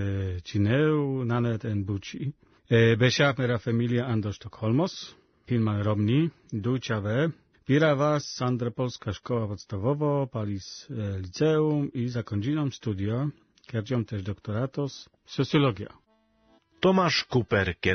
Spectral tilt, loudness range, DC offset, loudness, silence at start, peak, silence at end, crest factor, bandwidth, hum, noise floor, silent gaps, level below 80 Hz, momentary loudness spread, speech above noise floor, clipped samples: -6.5 dB/octave; 5 LU; under 0.1%; -27 LUFS; 0 s; -10 dBFS; 0 s; 18 dB; 6.6 kHz; none; -65 dBFS; none; -60 dBFS; 12 LU; 38 dB; under 0.1%